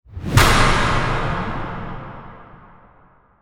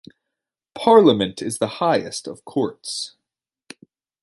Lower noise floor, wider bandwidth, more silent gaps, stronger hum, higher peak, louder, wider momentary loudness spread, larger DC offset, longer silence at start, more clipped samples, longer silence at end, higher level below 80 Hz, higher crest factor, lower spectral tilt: second, -52 dBFS vs -84 dBFS; first, 19.5 kHz vs 11.5 kHz; neither; neither; about the same, 0 dBFS vs -2 dBFS; about the same, -18 LUFS vs -19 LUFS; first, 20 LU vs 16 LU; neither; second, 0.1 s vs 0.75 s; neither; second, 0.95 s vs 1.15 s; first, -26 dBFS vs -62 dBFS; about the same, 20 dB vs 20 dB; about the same, -4.5 dB/octave vs -4.5 dB/octave